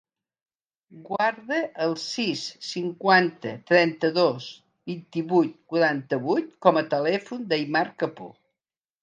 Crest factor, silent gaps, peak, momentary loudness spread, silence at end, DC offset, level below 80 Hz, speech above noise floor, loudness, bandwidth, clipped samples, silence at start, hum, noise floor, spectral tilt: 22 dB; none; -2 dBFS; 15 LU; 0.7 s; under 0.1%; -78 dBFS; over 65 dB; -24 LUFS; 9.4 kHz; under 0.1%; 0.9 s; none; under -90 dBFS; -5 dB/octave